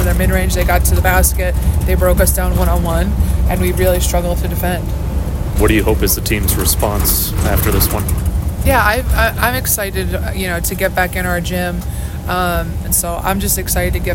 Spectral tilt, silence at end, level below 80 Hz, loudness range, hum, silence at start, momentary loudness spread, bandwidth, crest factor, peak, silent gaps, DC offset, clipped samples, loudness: -4.5 dB/octave; 0 s; -18 dBFS; 3 LU; none; 0 s; 7 LU; 17 kHz; 14 dB; 0 dBFS; none; under 0.1%; under 0.1%; -15 LUFS